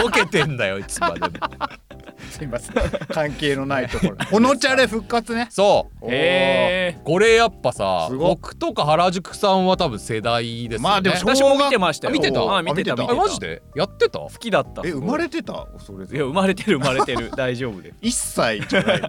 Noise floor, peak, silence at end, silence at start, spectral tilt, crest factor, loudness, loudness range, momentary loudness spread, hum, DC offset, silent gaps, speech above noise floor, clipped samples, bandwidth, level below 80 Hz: -40 dBFS; -6 dBFS; 0 s; 0 s; -4.5 dB/octave; 14 dB; -20 LUFS; 5 LU; 11 LU; none; under 0.1%; none; 20 dB; under 0.1%; 17 kHz; -42 dBFS